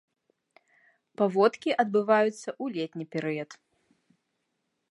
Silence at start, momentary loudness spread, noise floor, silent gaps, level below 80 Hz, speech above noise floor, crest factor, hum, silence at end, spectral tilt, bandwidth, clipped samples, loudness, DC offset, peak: 1.2 s; 12 LU; -79 dBFS; none; -84 dBFS; 53 dB; 22 dB; none; 1.4 s; -6 dB/octave; 11.5 kHz; under 0.1%; -27 LUFS; under 0.1%; -8 dBFS